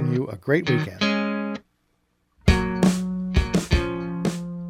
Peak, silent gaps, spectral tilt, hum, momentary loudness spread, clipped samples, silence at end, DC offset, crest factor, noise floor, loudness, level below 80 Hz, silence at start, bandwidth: -4 dBFS; none; -6 dB/octave; none; 7 LU; under 0.1%; 0 s; under 0.1%; 20 dB; -69 dBFS; -24 LUFS; -32 dBFS; 0 s; 15.5 kHz